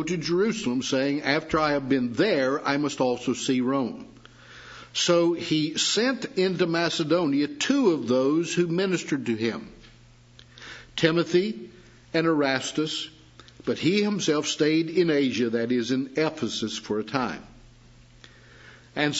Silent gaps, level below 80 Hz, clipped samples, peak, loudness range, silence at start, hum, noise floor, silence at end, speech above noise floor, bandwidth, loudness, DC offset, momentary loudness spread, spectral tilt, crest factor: none; -60 dBFS; under 0.1%; -6 dBFS; 4 LU; 0 s; none; -53 dBFS; 0 s; 28 dB; 8 kHz; -25 LUFS; under 0.1%; 10 LU; -4.5 dB/octave; 20 dB